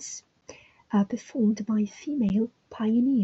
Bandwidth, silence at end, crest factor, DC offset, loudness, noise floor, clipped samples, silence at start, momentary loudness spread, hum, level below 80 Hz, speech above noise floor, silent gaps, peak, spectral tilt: 8 kHz; 0 s; 14 dB; under 0.1%; -27 LUFS; -51 dBFS; under 0.1%; 0 s; 8 LU; none; -62 dBFS; 26 dB; none; -12 dBFS; -6.5 dB/octave